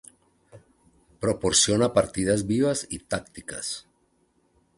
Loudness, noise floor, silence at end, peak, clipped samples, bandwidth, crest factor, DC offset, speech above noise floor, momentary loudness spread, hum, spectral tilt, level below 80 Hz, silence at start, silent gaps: -24 LUFS; -67 dBFS; 1 s; -6 dBFS; under 0.1%; 11.5 kHz; 22 dB; under 0.1%; 43 dB; 13 LU; none; -3.5 dB/octave; -52 dBFS; 0.55 s; none